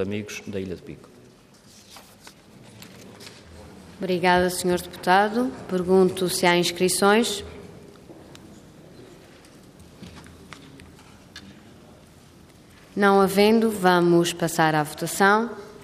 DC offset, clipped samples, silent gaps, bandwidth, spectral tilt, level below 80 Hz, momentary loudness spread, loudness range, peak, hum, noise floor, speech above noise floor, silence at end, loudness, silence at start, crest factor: under 0.1%; under 0.1%; none; 15.5 kHz; -4.5 dB/octave; -58 dBFS; 25 LU; 16 LU; -6 dBFS; none; -51 dBFS; 30 dB; 0 s; -21 LUFS; 0 s; 20 dB